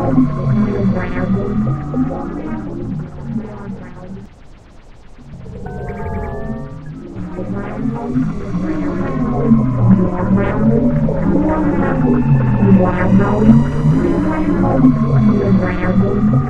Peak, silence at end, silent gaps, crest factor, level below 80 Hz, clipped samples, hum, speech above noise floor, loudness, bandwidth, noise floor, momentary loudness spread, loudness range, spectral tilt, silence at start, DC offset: 0 dBFS; 0 s; none; 14 dB; -28 dBFS; under 0.1%; none; 21 dB; -15 LUFS; 7.2 kHz; -39 dBFS; 16 LU; 16 LU; -10 dB/octave; 0 s; under 0.1%